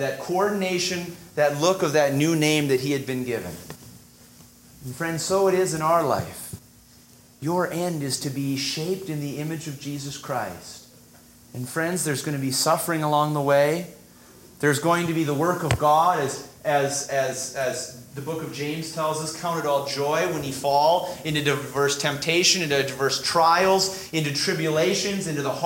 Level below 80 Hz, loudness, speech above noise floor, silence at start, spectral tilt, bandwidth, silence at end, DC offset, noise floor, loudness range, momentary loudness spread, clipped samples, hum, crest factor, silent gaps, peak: -56 dBFS; -23 LUFS; 28 dB; 0 s; -4 dB/octave; 16.5 kHz; 0 s; under 0.1%; -52 dBFS; 7 LU; 13 LU; under 0.1%; none; 20 dB; none; -4 dBFS